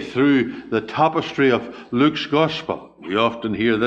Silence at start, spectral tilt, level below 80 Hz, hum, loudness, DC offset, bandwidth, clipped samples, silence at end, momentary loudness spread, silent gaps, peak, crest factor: 0 s; -6.5 dB/octave; -54 dBFS; none; -20 LUFS; under 0.1%; 7.8 kHz; under 0.1%; 0 s; 8 LU; none; -2 dBFS; 16 dB